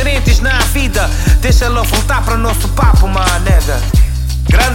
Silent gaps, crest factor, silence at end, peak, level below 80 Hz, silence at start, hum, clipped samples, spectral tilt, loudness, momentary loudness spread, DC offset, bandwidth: none; 10 dB; 0 s; 0 dBFS; -12 dBFS; 0 s; none; under 0.1%; -4.5 dB/octave; -12 LUFS; 3 LU; under 0.1%; 17 kHz